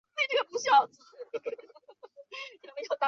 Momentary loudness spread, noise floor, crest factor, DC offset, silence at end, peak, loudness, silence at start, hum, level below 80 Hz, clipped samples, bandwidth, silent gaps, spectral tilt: 20 LU; -55 dBFS; 20 dB; under 0.1%; 0 s; -12 dBFS; -29 LUFS; 0.15 s; none; -88 dBFS; under 0.1%; 7.6 kHz; none; 0 dB/octave